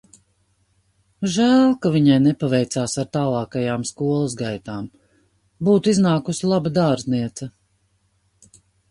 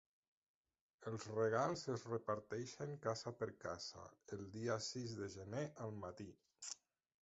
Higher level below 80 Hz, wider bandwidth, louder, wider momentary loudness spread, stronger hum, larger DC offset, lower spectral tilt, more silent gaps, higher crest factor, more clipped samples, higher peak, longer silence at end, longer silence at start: first, -56 dBFS vs -74 dBFS; first, 11.5 kHz vs 8 kHz; first, -20 LUFS vs -46 LUFS; about the same, 14 LU vs 14 LU; first, 50 Hz at -45 dBFS vs none; neither; about the same, -6 dB/octave vs -5 dB/octave; neither; about the same, 18 dB vs 22 dB; neither; first, -4 dBFS vs -24 dBFS; first, 1.4 s vs 0.45 s; first, 1.2 s vs 1 s